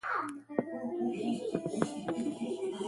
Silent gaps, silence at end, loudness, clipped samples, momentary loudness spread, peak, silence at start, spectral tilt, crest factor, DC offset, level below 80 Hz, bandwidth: none; 0 s; -36 LUFS; under 0.1%; 3 LU; -14 dBFS; 0.05 s; -6 dB/octave; 22 dB; under 0.1%; -72 dBFS; 11.5 kHz